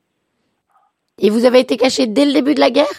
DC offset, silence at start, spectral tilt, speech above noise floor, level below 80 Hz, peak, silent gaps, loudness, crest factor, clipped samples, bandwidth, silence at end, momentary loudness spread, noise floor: under 0.1%; 1.2 s; -4 dB/octave; 55 dB; -62 dBFS; 0 dBFS; none; -13 LUFS; 14 dB; under 0.1%; 14.5 kHz; 0 s; 4 LU; -68 dBFS